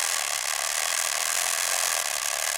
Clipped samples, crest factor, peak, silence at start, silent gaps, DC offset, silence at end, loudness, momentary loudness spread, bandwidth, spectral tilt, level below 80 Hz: under 0.1%; 18 dB; -8 dBFS; 0 s; none; under 0.1%; 0 s; -24 LUFS; 2 LU; 17 kHz; 3.5 dB/octave; -66 dBFS